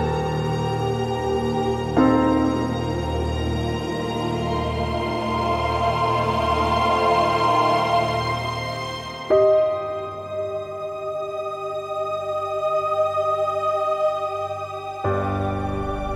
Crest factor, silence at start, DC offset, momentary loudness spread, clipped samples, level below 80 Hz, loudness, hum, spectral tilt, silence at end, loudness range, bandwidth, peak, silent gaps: 16 dB; 0 s; under 0.1%; 10 LU; under 0.1%; -38 dBFS; -23 LUFS; none; -6.5 dB/octave; 0 s; 4 LU; 15 kHz; -6 dBFS; none